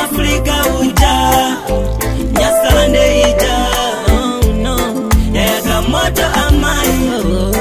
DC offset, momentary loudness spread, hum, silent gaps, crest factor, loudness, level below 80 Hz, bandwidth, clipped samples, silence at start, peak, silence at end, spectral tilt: under 0.1%; 5 LU; none; none; 12 dB; -13 LUFS; -18 dBFS; 16 kHz; under 0.1%; 0 s; 0 dBFS; 0 s; -4.5 dB/octave